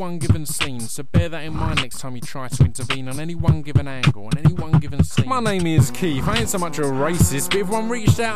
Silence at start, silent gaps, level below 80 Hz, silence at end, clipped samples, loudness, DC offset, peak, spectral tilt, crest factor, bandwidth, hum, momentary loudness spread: 0 s; none; -34 dBFS; 0 s; under 0.1%; -21 LUFS; 5%; -4 dBFS; -5.5 dB/octave; 16 dB; 15.5 kHz; none; 8 LU